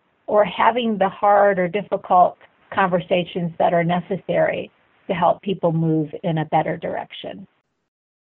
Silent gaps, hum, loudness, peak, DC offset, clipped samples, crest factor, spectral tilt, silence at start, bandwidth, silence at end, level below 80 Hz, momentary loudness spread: none; none; -20 LUFS; -4 dBFS; under 0.1%; under 0.1%; 18 dB; -11 dB/octave; 0.3 s; 4.1 kHz; 0.9 s; -60 dBFS; 12 LU